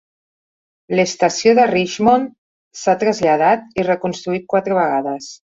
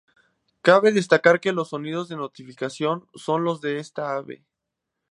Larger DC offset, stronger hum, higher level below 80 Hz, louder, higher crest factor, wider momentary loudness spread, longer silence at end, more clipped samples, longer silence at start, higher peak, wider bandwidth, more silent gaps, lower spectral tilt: neither; neither; first, -56 dBFS vs -74 dBFS; first, -17 LUFS vs -22 LUFS; second, 16 dB vs 22 dB; second, 9 LU vs 15 LU; second, 0.25 s vs 0.75 s; neither; first, 0.9 s vs 0.65 s; about the same, -2 dBFS vs -2 dBFS; second, 7.8 kHz vs 11 kHz; first, 2.38-2.71 s vs none; about the same, -4.5 dB/octave vs -5.5 dB/octave